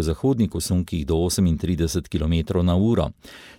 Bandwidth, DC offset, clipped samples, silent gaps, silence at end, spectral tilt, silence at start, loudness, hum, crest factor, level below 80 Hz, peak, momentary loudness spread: 17 kHz; under 0.1%; under 0.1%; none; 0.05 s; -6.5 dB/octave; 0 s; -22 LUFS; none; 14 dB; -34 dBFS; -8 dBFS; 4 LU